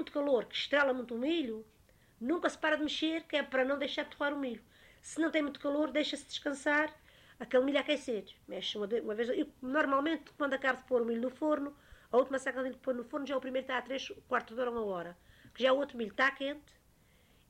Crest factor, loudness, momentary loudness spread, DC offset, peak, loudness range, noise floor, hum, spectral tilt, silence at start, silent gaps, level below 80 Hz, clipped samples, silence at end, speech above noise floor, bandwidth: 18 dB; -34 LUFS; 10 LU; under 0.1%; -16 dBFS; 2 LU; -66 dBFS; none; -3.5 dB/octave; 0 s; none; -70 dBFS; under 0.1%; 0.9 s; 32 dB; 15 kHz